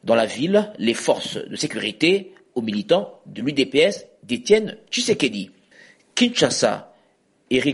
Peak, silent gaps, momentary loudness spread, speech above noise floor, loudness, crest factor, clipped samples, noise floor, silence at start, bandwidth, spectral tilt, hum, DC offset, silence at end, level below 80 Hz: -4 dBFS; none; 11 LU; 41 dB; -21 LUFS; 18 dB; under 0.1%; -61 dBFS; 0.05 s; 11.5 kHz; -3.5 dB/octave; none; under 0.1%; 0 s; -62 dBFS